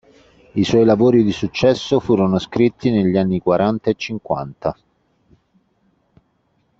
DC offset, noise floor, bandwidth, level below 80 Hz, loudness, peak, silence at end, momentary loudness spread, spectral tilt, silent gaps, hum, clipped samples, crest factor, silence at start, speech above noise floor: under 0.1%; -64 dBFS; 7.8 kHz; -50 dBFS; -17 LUFS; -2 dBFS; 2.05 s; 11 LU; -7 dB/octave; none; none; under 0.1%; 16 dB; 0.55 s; 47 dB